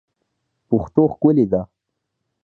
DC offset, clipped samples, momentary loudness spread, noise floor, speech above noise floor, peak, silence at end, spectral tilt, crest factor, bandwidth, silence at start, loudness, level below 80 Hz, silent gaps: under 0.1%; under 0.1%; 8 LU; -77 dBFS; 61 dB; -2 dBFS; 0.8 s; -12.5 dB/octave; 20 dB; 4.2 kHz; 0.7 s; -18 LUFS; -48 dBFS; none